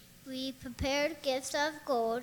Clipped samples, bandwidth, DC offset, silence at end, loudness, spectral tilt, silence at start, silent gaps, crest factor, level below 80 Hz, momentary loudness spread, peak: under 0.1%; 19.5 kHz; under 0.1%; 0 s; -34 LUFS; -3.5 dB/octave; 0 s; none; 16 dB; -54 dBFS; 8 LU; -20 dBFS